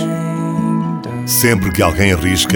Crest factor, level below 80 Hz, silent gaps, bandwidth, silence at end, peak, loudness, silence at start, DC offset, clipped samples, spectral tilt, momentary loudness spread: 14 dB; -32 dBFS; none; over 20 kHz; 0 s; 0 dBFS; -15 LUFS; 0 s; under 0.1%; under 0.1%; -4.5 dB/octave; 7 LU